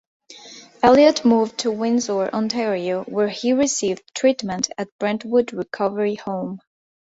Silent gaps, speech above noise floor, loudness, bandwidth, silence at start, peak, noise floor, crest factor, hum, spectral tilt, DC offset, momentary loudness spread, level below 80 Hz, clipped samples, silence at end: 4.92-4.99 s; 23 dB; -20 LUFS; 8 kHz; 0.3 s; 0 dBFS; -43 dBFS; 20 dB; none; -4 dB/octave; under 0.1%; 13 LU; -58 dBFS; under 0.1%; 0.5 s